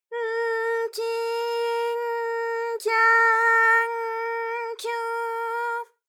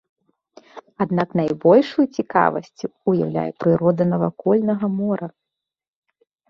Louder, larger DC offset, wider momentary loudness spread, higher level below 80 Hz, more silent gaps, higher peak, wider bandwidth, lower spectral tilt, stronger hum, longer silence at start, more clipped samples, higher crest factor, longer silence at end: second, -23 LUFS vs -20 LUFS; neither; about the same, 11 LU vs 11 LU; second, under -90 dBFS vs -62 dBFS; neither; second, -10 dBFS vs -2 dBFS; first, 17 kHz vs 6.8 kHz; second, 2.5 dB/octave vs -8.5 dB/octave; neither; second, 0.1 s vs 0.75 s; neither; about the same, 16 dB vs 20 dB; second, 0.25 s vs 1.2 s